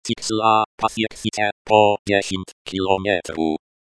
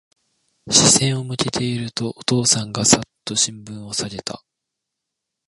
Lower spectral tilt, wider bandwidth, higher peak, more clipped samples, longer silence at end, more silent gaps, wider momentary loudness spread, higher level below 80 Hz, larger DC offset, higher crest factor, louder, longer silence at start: about the same, -4 dB/octave vs -3 dB/octave; about the same, 11 kHz vs 11.5 kHz; about the same, 0 dBFS vs 0 dBFS; neither; second, 0.4 s vs 1.1 s; first, 0.66-0.78 s, 1.52-1.65 s, 1.99-2.05 s, 2.52-2.65 s vs none; second, 11 LU vs 15 LU; about the same, -52 dBFS vs -52 dBFS; neither; about the same, 20 dB vs 22 dB; about the same, -20 LUFS vs -18 LUFS; second, 0.05 s vs 0.65 s